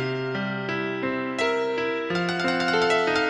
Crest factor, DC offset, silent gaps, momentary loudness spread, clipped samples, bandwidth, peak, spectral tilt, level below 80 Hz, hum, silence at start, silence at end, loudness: 14 dB; under 0.1%; none; 7 LU; under 0.1%; 11 kHz; -10 dBFS; -5 dB/octave; -60 dBFS; none; 0 s; 0 s; -25 LUFS